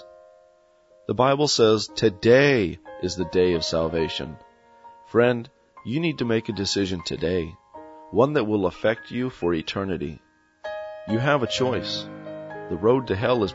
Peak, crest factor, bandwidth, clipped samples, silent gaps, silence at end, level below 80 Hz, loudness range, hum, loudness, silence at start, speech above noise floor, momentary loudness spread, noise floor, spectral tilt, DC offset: -4 dBFS; 20 dB; 8 kHz; under 0.1%; none; 0 s; -52 dBFS; 5 LU; none; -23 LUFS; 0 s; 35 dB; 16 LU; -58 dBFS; -5 dB/octave; under 0.1%